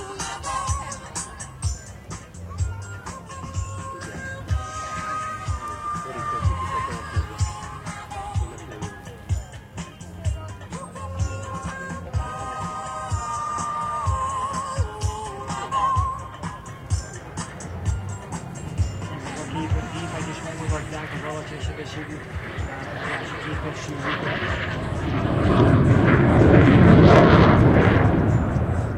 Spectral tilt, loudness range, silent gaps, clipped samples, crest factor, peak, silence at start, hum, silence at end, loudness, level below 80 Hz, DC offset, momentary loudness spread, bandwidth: -6.5 dB/octave; 16 LU; none; under 0.1%; 22 dB; 0 dBFS; 0 s; none; 0 s; -23 LUFS; -34 dBFS; under 0.1%; 18 LU; 11.5 kHz